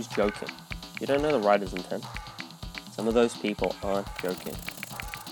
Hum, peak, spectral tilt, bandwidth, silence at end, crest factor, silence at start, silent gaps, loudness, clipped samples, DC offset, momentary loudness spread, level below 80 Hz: none; -8 dBFS; -5 dB/octave; 19 kHz; 0 s; 22 dB; 0 s; none; -29 LUFS; under 0.1%; under 0.1%; 14 LU; -48 dBFS